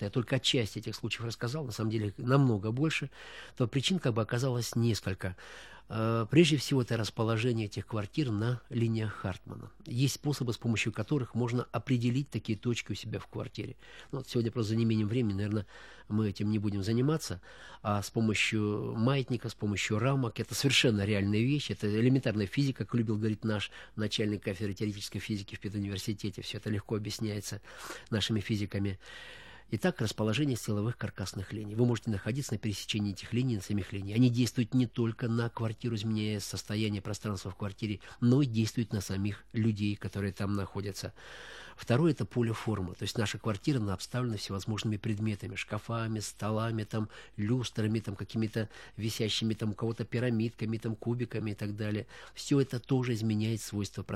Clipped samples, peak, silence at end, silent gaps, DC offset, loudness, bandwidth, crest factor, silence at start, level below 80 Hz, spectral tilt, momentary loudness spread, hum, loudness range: under 0.1%; -8 dBFS; 0 s; none; 0.1%; -32 LUFS; 14.5 kHz; 24 dB; 0 s; -60 dBFS; -5.5 dB/octave; 11 LU; none; 5 LU